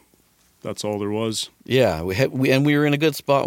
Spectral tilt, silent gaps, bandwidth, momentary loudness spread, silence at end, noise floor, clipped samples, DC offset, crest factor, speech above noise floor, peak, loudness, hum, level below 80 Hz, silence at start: -5.5 dB/octave; none; 17 kHz; 11 LU; 0 s; -59 dBFS; under 0.1%; under 0.1%; 18 dB; 39 dB; -4 dBFS; -21 LUFS; none; -52 dBFS; 0.65 s